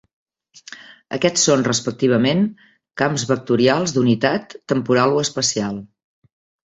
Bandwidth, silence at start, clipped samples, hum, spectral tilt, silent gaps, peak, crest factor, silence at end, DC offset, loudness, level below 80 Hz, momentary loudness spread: 8.4 kHz; 0.7 s; under 0.1%; none; -4 dB/octave; none; -2 dBFS; 18 dB; 0.8 s; under 0.1%; -18 LUFS; -58 dBFS; 16 LU